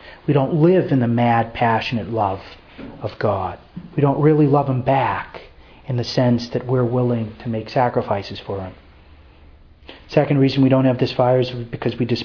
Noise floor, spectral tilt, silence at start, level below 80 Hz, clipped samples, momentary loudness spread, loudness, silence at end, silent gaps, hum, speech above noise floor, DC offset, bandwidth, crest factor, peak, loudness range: -46 dBFS; -8.5 dB/octave; 0 s; -48 dBFS; under 0.1%; 14 LU; -19 LUFS; 0 s; none; none; 28 dB; under 0.1%; 5.4 kHz; 18 dB; -2 dBFS; 4 LU